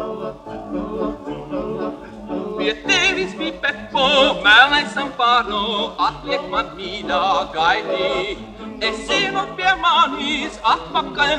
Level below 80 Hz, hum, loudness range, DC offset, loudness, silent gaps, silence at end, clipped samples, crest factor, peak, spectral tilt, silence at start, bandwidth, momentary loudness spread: -44 dBFS; none; 6 LU; under 0.1%; -18 LUFS; none; 0 s; under 0.1%; 20 dB; 0 dBFS; -3 dB/octave; 0 s; 11 kHz; 14 LU